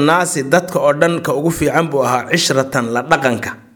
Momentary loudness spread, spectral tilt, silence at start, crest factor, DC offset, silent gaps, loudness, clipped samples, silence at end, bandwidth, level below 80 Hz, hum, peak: 4 LU; -4.5 dB/octave; 0 s; 16 dB; under 0.1%; none; -15 LUFS; under 0.1%; 0.15 s; over 20 kHz; -46 dBFS; none; 0 dBFS